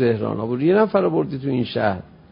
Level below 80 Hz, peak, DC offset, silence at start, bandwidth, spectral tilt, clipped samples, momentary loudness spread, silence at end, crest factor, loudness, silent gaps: -52 dBFS; -4 dBFS; under 0.1%; 0 s; 5.4 kHz; -12 dB/octave; under 0.1%; 7 LU; 0.25 s; 16 dB; -20 LUFS; none